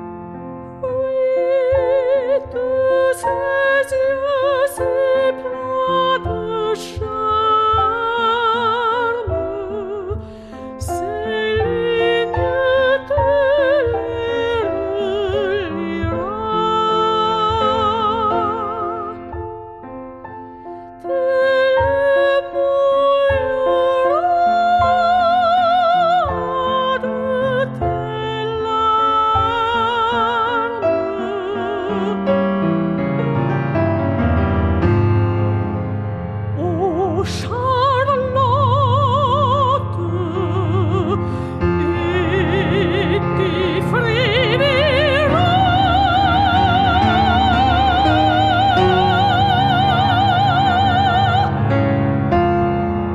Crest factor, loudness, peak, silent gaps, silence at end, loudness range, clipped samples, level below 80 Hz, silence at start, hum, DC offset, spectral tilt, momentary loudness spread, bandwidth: 14 dB; -17 LUFS; -2 dBFS; none; 0 s; 5 LU; under 0.1%; -36 dBFS; 0 s; none; under 0.1%; -7 dB/octave; 9 LU; 12.5 kHz